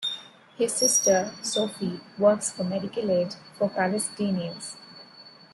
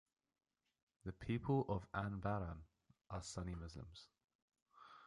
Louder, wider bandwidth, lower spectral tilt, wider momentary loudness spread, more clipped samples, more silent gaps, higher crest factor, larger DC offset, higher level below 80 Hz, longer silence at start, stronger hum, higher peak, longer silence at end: first, -25 LUFS vs -45 LUFS; first, 12.5 kHz vs 11 kHz; second, -3 dB/octave vs -6.5 dB/octave; about the same, 17 LU vs 18 LU; neither; second, none vs 4.24-4.28 s, 4.35-4.48 s, 4.62-4.66 s; about the same, 18 dB vs 20 dB; neither; second, -70 dBFS vs -60 dBFS; second, 0 s vs 1.05 s; neither; first, -8 dBFS vs -26 dBFS; first, 0.25 s vs 0 s